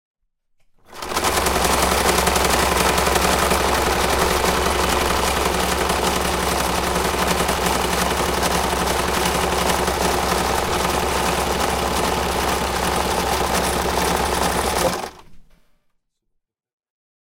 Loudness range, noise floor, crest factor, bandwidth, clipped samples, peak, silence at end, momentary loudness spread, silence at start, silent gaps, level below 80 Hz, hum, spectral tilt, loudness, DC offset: 4 LU; -73 dBFS; 18 dB; 17 kHz; under 0.1%; -2 dBFS; 1.85 s; 3 LU; 0.9 s; none; -32 dBFS; none; -3 dB/octave; -19 LUFS; under 0.1%